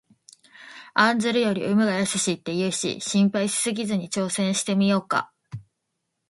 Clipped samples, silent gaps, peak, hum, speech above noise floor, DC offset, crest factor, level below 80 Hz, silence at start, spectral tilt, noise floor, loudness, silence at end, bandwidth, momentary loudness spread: under 0.1%; none; -4 dBFS; none; 56 dB; under 0.1%; 22 dB; -66 dBFS; 0.6 s; -4 dB/octave; -78 dBFS; -23 LUFS; 0.7 s; 11.5 kHz; 17 LU